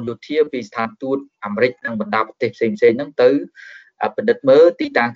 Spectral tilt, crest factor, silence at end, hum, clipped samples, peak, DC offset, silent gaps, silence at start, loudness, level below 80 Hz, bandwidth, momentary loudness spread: -4 dB/octave; 16 dB; 0 s; none; under 0.1%; -2 dBFS; under 0.1%; none; 0 s; -18 LUFS; -68 dBFS; 7.2 kHz; 12 LU